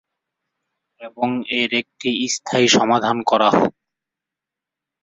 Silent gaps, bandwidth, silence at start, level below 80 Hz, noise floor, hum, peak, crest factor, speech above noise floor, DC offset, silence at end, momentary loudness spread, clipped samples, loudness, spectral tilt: none; 8.4 kHz; 1 s; -62 dBFS; -86 dBFS; none; -2 dBFS; 18 dB; 68 dB; under 0.1%; 1.35 s; 9 LU; under 0.1%; -18 LUFS; -3.5 dB/octave